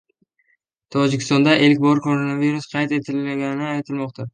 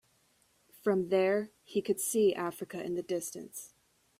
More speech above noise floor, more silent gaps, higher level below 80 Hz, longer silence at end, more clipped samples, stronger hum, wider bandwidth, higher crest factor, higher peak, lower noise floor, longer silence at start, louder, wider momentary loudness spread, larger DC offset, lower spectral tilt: first, 48 dB vs 39 dB; neither; first, -64 dBFS vs -76 dBFS; second, 0.05 s vs 0.55 s; neither; neither; second, 9.6 kHz vs 16 kHz; about the same, 18 dB vs 16 dB; first, -2 dBFS vs -16 dBFS; about the same, -67 dBFS vs -70 dBFS; about the same, 0.9 s vs 0.85 s; first, -19 LUFS vs -32 LUFS; second, 11 LU vs 15 LU; neither; first, -6 dB/octave vs -4.5 dB/octave